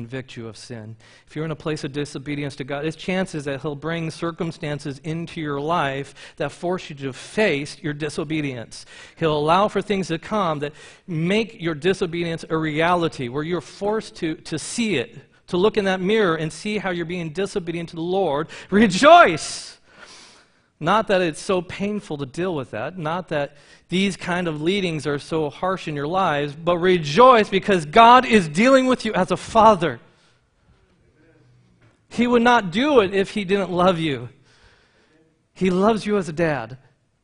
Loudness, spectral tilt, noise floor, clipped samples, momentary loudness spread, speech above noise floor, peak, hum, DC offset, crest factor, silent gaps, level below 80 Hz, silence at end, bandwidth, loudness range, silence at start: -21 LUFS; -5.5 dB/octave; -60 dBFS; under 0.1%; 14 LU; 39 dB; 0 dBFS; none; under 0.1%; 22 dB; none; -52 dBFS; 0.5 s; 10.5 kHz; 10 LU; 0 s